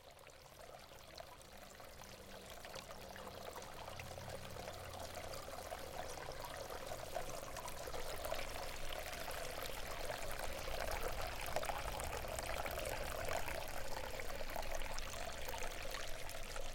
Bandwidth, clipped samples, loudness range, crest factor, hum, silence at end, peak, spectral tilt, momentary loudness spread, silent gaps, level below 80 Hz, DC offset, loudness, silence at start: 17 kHz; under 0.1%; 8 LU; 22 dB; none; 0 s; -24 dBFS; -3 dB/octave; 11 LU; none; -52 dBFS; under 0.1%; -46 LUFS; 0 s